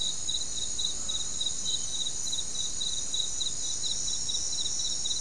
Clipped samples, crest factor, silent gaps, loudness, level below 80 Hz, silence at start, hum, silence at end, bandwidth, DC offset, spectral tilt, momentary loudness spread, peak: under 0.1%; 16 dB; none; -29 LUFS; -52 dBFS; 0 s; none; 0 s; 12 kHz; 2%; 0.5 dB/octave; 2 LU; -16 dBFS